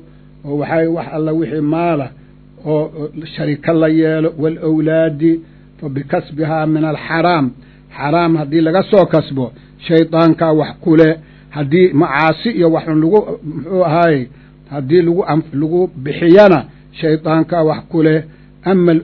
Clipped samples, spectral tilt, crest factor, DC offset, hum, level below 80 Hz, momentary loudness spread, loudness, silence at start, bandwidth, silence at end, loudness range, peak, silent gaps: 0.2%; -10 dB/octave; 14 dB; under 0.1%; 50 Hz at -40 dBFS; -46 dBFS; 13 LU; -14 LUFS; 0.45 s; 6 kHz; 0 s; 4 LU; 0 dBFS; none